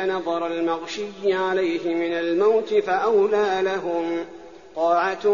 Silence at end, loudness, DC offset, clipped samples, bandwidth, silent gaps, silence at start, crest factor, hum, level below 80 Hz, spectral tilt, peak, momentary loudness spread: 0 s; -22 LUFS; 0.2%; under 0.1%; 7.2 kHz; none; 0 s; 14 dB; none; -64 dBFS; -3 dB/octave; -8 dBFS; 9 LU